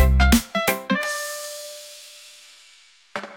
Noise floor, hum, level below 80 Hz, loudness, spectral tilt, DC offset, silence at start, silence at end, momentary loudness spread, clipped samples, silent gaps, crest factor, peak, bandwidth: -53 dBFS; none; -26 dBFS; -22 LUFS; -4.5 dB/octave; under 0.1%; 0 s; 0 s; 23 LU; under 0.1%; none; 18 dB; -4 dBFS; 17 kHz